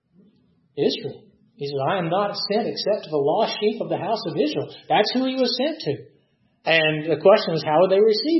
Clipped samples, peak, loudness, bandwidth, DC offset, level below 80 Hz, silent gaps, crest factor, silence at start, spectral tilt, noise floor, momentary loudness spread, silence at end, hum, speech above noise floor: under 0.1%; -2 dBFS; -21 LUFS; 6 kHz; under 0.1%; -72 dBFS; none; 20 dB; 0.75 s; -6.5 dB/octave; -63 dBFS; 13 LU; 0 s; none; 42 dB